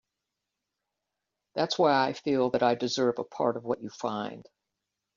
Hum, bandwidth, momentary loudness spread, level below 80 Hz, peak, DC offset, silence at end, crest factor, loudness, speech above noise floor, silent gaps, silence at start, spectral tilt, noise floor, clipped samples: none; 7.4 kHz; 10 LU; -72 dBFS; -12 dBFS; under 0.1%; 0.75 s; 18 dB; -28 LUFS; 58 dB; none; 1.55 s; -3.5 dB/octave; -86 dBFS; under 0.1%